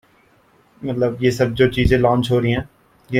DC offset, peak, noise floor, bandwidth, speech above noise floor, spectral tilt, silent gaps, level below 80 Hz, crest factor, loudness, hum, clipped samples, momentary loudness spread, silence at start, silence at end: under 0.1%; -2 dBFS; -55 dBFS; 15.5 kHz; 38 dB; -7 dB/octave; none; -34 dBFS; 16 dB; -18 LUFS; none; under 0.1%; 11 LU; 0.8 s; 0 s